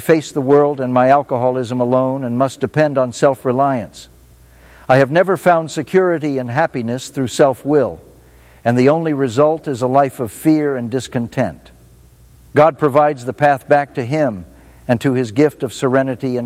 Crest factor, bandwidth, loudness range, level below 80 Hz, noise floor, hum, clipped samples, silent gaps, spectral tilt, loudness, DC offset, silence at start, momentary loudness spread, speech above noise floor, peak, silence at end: 16 dB; 16 kHz; 2 LU; -52 dBFS; -45 dBFS; none; under 0.1%; none; -6.5 dB/octave; -16 LUFS; under 0.1%; 0 s; 8 LU; 30 dB; 0 dBFS; 0 s